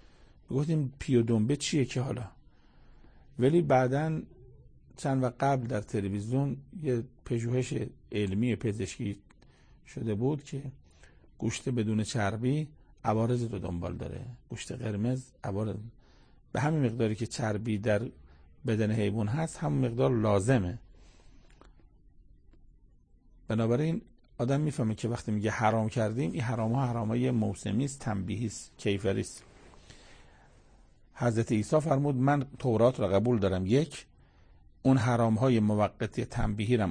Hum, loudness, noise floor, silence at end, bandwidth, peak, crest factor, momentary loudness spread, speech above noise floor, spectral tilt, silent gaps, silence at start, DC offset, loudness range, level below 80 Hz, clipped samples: none; -30 LUFS; -60 dBFS; 0 s; 9.8 kHz; -12 dBFS; 20 dB; 12 LU; 31 dB; -7 dB/octave; none; 0.2 s; under 0.1%; 7 LU; -52 dBFS; under 0.1%